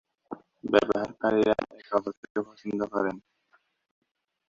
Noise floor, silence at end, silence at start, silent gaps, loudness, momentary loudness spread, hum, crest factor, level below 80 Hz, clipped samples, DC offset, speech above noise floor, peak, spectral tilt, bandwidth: -68 dBFS; 1.3 s; 0.3 s; 2.17-2.23 s, 2.30-2.35 s; -28 LUFS; 20 LU; none; 26 dB; -64 dBFS; under 0.1%; under 0.1%; 41 dB; -4 dBFS; -6 dB/octave; 7.6 kHz